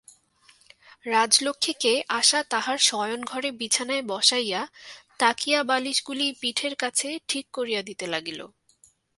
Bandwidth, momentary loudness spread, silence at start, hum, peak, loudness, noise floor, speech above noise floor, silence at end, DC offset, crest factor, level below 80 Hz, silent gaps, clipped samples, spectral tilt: 12 kHz; 10 LU; 1.05 s; none; -2 dBFS; -24 LUFS; -61 dBFS; 35 dB; 0.7 s; under 0.1%; 24 dB; -74 dBFS; none; under 0.1%; -0.5 dB/octave